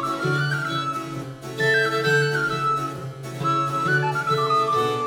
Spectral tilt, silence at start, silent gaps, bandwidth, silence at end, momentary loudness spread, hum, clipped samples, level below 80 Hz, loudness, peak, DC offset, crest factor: -5 dB/octave; 0 s; none; 17.5 kHz; 0 s; 12 LU; none; under 0.1%; -58 dBFS; -22 LUFS; -8 dBFS; under 0.1%; 14 dB